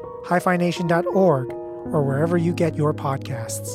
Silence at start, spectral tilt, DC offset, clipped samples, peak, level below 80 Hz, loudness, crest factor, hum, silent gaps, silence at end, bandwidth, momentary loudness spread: 0 s; -6.5 dB/octave; under 0.1%; under 0.1%; -6 dBFS; -56 dBFS; -22 LUFS; 16 dB; none; none; 0 s; 15.5 kHz; 9 LU